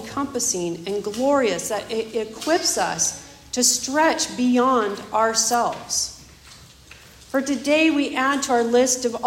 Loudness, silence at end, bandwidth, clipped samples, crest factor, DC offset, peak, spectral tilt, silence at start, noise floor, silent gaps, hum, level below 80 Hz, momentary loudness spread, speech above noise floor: -21 LUFS; 0 s; 16.5 kHz; under 0.1%; 18 dB; under 0.1%; -4 dBFS; -2 dB/octave; 0 s; -46 dBFS; none; none; -56 dBFS; 9 LU; 25 dB